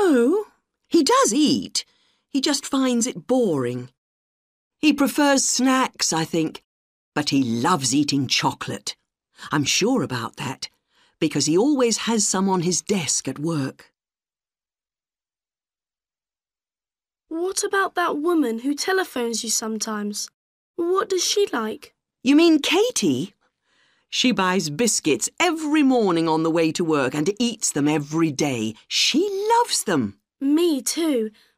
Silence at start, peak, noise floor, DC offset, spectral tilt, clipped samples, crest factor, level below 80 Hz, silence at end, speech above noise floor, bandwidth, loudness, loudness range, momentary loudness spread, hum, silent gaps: 0 s; -4 dBFS; under -90 dBFS; under 0.1%; -3.5 dB/octave; under 0.1%; 18 dB; -66 dBFS; 0.3 s; over 69 dB; 15.5 kHz; -21 LUFS; 5 LU; 11 LU; none; 3.98-4.70 s, 6.64-7.12 s, 20.34-20.74 s